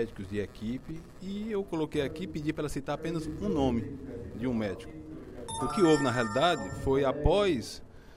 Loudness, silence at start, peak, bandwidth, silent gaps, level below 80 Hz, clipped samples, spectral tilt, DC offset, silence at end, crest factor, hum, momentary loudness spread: -31 LUFS; 0 s; -10 dBFS; 15.5 kHz; none; -46 dBFS; under 0.1%; -6 dB/octave; under 0.1%; 0 s; 20 dB; none; 16 LU